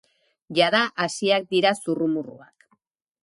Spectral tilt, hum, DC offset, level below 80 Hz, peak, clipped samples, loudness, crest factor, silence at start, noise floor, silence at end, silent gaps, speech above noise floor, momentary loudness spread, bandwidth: -4 dB/octave; none; under 0.1%; -74 dBFS; -4 dBFS; under 0.1%; -22 LUFS; 20 dB; 0.5 s; -67 dBFS; 0.85 s; none; 45 dB; 8 LU; 11.5 kHz